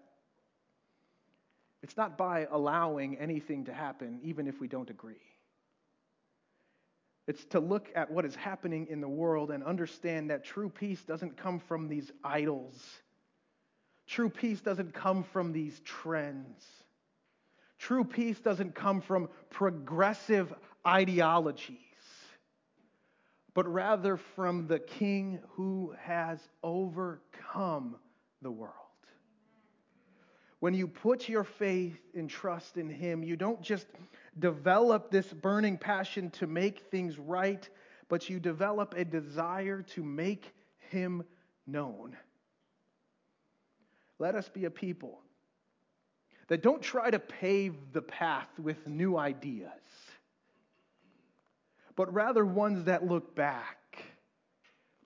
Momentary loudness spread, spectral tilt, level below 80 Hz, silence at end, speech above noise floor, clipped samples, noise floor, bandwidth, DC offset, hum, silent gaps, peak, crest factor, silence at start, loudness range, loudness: 14 LU; -7 dB/octave; under -90 dBFS; 0.95 s; 45 dB; under 0.1%; -78 dBFS; 7.6 kHz; under 0.1%; none; none; -12 dBFS; 22 dB; 1.85 s; 10 LU; -34 LUFS